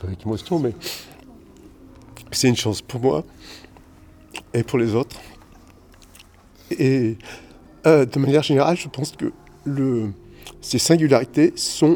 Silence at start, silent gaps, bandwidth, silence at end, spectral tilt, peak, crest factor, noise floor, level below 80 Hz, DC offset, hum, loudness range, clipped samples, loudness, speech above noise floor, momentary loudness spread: 0 s; none; over 20 kHz; 0 s; -5.5 dB/octave; -2 dBFS; 20 dB; -49 dBFS; -52 dBFS; under 0.1%; none; 6 LU; under 0.1%; -20 LUFS; 29 dB; 21 LU